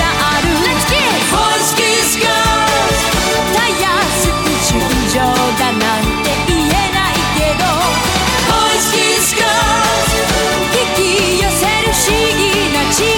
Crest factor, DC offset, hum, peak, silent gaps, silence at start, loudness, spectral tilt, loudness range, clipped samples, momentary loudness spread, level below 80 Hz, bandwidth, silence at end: 12 dB; under 0.1%; none; -2 dBFS; none; 0 s; -12 LUFS; -2.5 dB/octave; 1 LU; under 0.1%; 2 LU; -26 dBFS; 19.5 kHz; 0 s